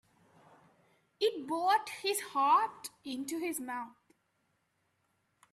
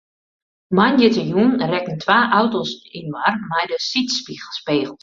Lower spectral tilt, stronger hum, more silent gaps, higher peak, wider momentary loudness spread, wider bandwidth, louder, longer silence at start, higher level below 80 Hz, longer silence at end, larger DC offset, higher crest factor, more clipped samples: second, -1.5 dB/octave vs -5 dB/octave; neither; neither; second, -16 dBFS vs -2 dBFS; about the same, 14 LU vs 13 LU; first, 15.5 kHz vs 7.6 kHz; second, -33 LUFS vs -18 LUFS; first, 1.2 s vs 0.7 s; second, -84 dBFS vs -60 dBFS; first, 1.65 s vs 0.05 s; neither; about the same, 20 dB vs 18 dB; neither